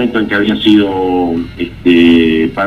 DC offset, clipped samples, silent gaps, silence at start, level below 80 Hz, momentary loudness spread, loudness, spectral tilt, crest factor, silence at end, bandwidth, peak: 0.4%; under 0.1%; none; 0 s; -36 dBFS; 9 LU; -11 LUFS; -7 dB/octave; 10 dB; 0 s; 7 kHz; 0 dBFS